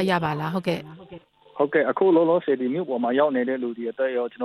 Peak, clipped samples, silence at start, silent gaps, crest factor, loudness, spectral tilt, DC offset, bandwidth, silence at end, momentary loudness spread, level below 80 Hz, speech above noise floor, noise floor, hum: -8 dBFS; under 0.1%; 0 s; none; 16 dB; -23 LUFS; -7.5 dB/octave; under 0.1%; 13.5 kHz; 0 s; 11 LU; -66 dBFS; 24 dB; -46 dBFS; none